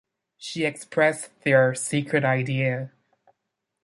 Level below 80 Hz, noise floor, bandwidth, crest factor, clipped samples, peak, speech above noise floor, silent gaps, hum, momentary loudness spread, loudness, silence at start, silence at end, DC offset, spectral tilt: -68 dBFS; -81 dBFS; 11.5 kHz; 20 dB; under 0.1%; -6 dBFS; 58 dB; none; none; 13 LU; -23 LUFS; 0.4 s; 0.95 s; under 0.1%; -5 dB/octave